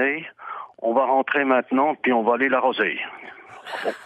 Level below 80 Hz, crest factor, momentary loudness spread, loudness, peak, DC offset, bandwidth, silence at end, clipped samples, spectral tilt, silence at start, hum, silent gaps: -78 dBFS; 16 dB; 16 LU; -21 LUFS; -6 dBFS; under 0.1%; 10 kHz; 0 s; under 0.1%; -5.5 dB/octave; 0 s; none; none